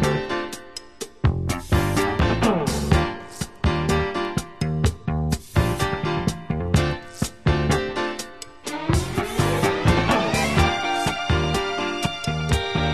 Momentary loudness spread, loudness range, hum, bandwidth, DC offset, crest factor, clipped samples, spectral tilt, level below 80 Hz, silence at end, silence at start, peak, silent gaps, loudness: 9 LU; 3 LU; none; 13.5 kHz; 0.6%; 18 dB; under 0.1%; -5.5 dB/octave; -30 dBFS; 0 s; 0 s; -4 dBFS; none; -23 LUFS